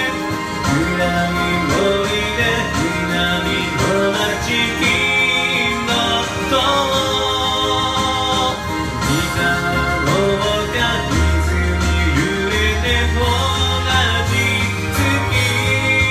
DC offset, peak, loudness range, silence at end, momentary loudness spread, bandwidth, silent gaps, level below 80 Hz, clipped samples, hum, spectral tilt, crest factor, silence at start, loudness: under 0.1%; -4 dBFS; 2 LU; 0 s; 3 LU; 15.5 kHz; none; -28 dBFS; under 0.1%; none; -4 dB/octave; 14 dB; 0 s; -16 LUFS